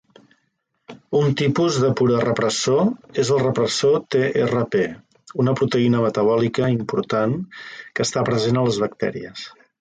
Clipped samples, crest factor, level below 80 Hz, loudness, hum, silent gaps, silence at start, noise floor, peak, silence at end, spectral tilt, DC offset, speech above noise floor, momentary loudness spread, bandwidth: under 0.1%; 14 dB; -56 dBFS; -20 LUFS; none; none; 0.9 s; -71 dBFS; -6 dBFS; 0.35 s; -5.5 dB/octave; under 0.1%; 51 dB; 9 LU; 9.4 kHz